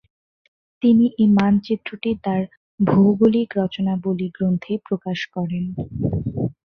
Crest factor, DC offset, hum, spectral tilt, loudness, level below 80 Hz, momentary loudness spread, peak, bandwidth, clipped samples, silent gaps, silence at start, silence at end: 16 dB; under 0.1%; none; -9 dB/octave; -20 LUFS; -48 dBFS; 10 LU; -4 dBFS; 6.4 kHz; under 0.1%; 2.57-2.78 s; 0.8 s; 0.15 s